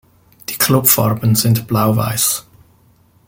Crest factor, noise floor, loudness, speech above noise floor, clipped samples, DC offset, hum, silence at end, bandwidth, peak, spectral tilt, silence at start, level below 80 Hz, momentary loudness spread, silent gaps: 16 dB; -52 dBFS; -14 LUFS; 38 dB; under 0.1%; under 0.1%; none; 0.85 s; 17 kHz; 0 dBFS; -4.5 dB/octave; 0.5 s; -48 dBFS; 11 LU; none